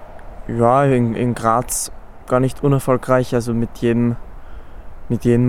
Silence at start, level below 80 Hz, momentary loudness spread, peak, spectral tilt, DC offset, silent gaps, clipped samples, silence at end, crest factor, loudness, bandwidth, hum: 0 s; -36 dBFS; 10 LU; -2 dBFS; -6.5 dB/octave; under 0.1%; none; under 0.1%; 0 s; 16 dB; -18 LUFS; 16.5 kHz; none